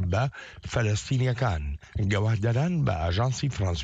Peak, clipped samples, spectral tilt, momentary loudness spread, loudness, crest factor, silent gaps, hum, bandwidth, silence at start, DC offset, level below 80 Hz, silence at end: -14 dBFS; under 0.1%; -6 dB/octave; 7 LU; -27 LUFS; 12 dB; none; none; 8 kHz; 0 s; under 0.1%; -40 dBFS; 0 s